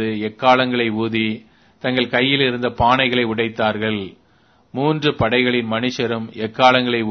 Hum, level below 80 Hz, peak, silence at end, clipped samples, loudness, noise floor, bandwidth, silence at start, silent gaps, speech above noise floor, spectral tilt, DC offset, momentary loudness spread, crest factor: none; -48 dBFS; 0 dBFS; 0 s; under 0.1%; -18 LUFS; -56 dBFS; 6.4 kHz; 0 s; none; 38 dB; -6 dB/octave; under 0.1%; 10 LU; 18 dB